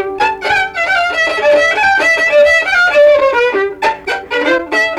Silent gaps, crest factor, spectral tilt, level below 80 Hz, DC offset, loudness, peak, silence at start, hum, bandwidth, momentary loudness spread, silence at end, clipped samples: none; 10 dB; -2.5 dB/octave; -46 dBFS; under 0.1%; -11 LUFS; -2 dBFS; 0 s; none; 13 kHz; 7 LU; 0 s; under 0.1%